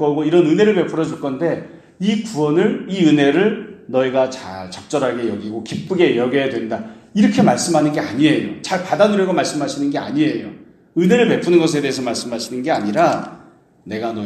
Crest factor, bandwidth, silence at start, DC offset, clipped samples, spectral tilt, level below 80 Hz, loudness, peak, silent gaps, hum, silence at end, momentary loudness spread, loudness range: 16 dB; 13 kHz; 0 s; under 0.1%; under 0.1%; -5.5 dB/octave; -60 dBFS; -17 LUFS; 0 dBFS; none; none; 0 s; 12 LU; 2 LU